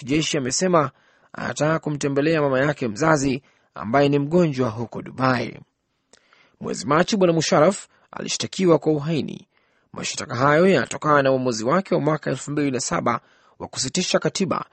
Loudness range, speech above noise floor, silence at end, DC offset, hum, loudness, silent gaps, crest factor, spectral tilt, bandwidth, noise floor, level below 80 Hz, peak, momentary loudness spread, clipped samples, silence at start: 3 LU; 39 dB; 0.1 s; under 0.1%; none; -21 LUFS; none; 20 dB; -5 dB/octave; 8.8 kHz; -60 dBFS; -56 dBFS; -2 dBFS; 14 LU; under 0.1%; 0 s